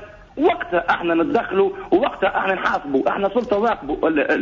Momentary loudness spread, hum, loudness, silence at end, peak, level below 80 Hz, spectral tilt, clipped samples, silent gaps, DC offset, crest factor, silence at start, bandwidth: 3 LU; none; -20 LUFS; 0 s; -6 dBFS; -48 dBFS; -6.5 dB/octave; under 0.1%; none; under 0.1%; 14 dB; 0 s; 7.4 kHz